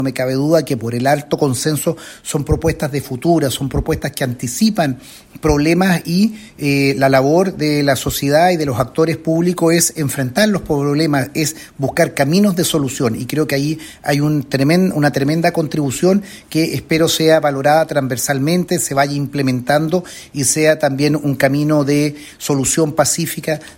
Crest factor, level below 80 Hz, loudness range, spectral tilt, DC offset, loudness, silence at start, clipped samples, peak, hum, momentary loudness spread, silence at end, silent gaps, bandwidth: 14 dB; -38 dBFS; 3 LU; -5 dB/octave; under 0.1%; -16 LUFS; 0 s; under 0.1%; 0 dBFS; none; 7 LU; 0.05 s; none; 16.5 kHz